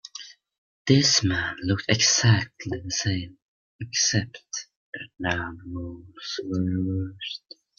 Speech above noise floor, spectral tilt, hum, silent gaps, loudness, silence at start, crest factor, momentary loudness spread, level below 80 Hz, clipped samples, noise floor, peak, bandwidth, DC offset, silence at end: 20 dB; -3.5 dB/octave; none; 0.58-0.85 s, 3.42-3.79 s, 4.76-4.93 s; -24 LUFS; 0.05 s; 22 dB; 20 LU; -56 dBFS; under 0.1%; -45 dBFS; -4 dBFS; 7.4 kHz; under 0.1%; 0.4 s